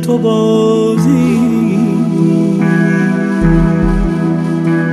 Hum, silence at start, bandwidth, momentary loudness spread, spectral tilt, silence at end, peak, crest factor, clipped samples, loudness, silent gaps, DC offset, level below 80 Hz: none; 0 s; 12.5 kHz; 3 LU; -8 dB/octave; 0 s; 0 dBFS; 10 dB; under 0.1%; -12 LUFS; none; under 0.1%; -24 dBFS